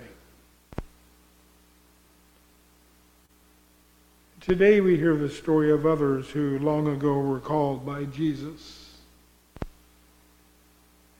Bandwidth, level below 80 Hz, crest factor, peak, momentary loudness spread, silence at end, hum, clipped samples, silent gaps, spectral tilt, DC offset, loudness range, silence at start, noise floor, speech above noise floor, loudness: 16.5 kHz; -52 dBFS; 20 dB; -8 dBFS; 22 LU; 1.5 s; 60 Hz at -55 dBFS; under 0.1%; none; -8 dB/octave; under 0.1%; 12 LU; 0 s; -59 dBFS; 35 dB; -24 LUFS